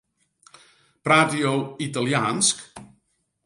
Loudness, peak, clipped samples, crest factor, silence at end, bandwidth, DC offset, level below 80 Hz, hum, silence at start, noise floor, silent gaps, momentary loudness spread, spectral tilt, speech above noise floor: -22 LUFS; -4 dBFS; under 0.1%; 22 dB; 0.6 s; 11.5 kHz; under 0.1%; -66 dBFS; none; 1.05 s; -71 dBFS; none; 14 LU; -3.5 dB/octave; 49 dB